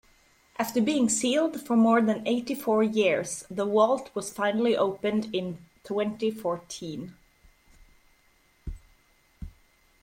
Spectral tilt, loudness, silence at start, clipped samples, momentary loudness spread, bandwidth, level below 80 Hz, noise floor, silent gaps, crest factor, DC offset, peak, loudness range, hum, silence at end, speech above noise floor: -4.5 dB/octave; -26 LUFS; 0.6 s; under 0.1%; 21 LU; 16.5 kHz; -54 dBFS; -64 dBFS; none; 18 dB; under 0.1%; -8 dBFS; 12 LU; none; 0.55 s; 38 dB